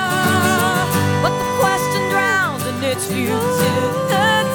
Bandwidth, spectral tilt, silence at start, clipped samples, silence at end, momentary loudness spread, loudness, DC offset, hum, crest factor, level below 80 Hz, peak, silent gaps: over 20 kHz; -4.5 dB/octave; 0 s; under 0.1%; 0 s; 5 LU; -17 LUFS; 0.1%; 50 Hz at -40 dBFS; 14 dB; -48 dBFS; -4 dBFS; none